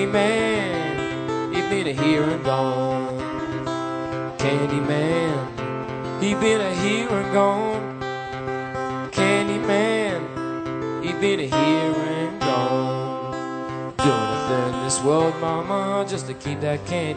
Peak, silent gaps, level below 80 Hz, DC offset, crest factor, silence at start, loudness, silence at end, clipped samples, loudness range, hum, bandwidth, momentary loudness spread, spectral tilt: -6 dBFS; none; -52 dBFS; under 0.1%; 16 dB; 0 s; -23 LUFS; 0 s; under 0.1%; 2 LU; none; 9.2 kHz; 9 LU; -5 dB/octave